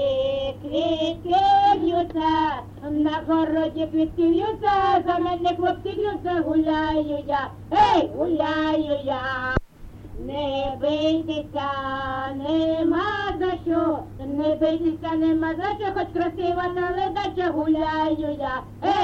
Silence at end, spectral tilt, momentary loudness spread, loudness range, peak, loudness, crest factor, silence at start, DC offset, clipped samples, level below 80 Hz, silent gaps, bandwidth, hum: 0 s; -6.5 dB/octave; 7 LU; 3 LU; -6 dBFS; -23 LUFS; 16 dB; 0 s; under 0.1%; under 0.1%; -44 dBFS; none; 7.2 kHz; none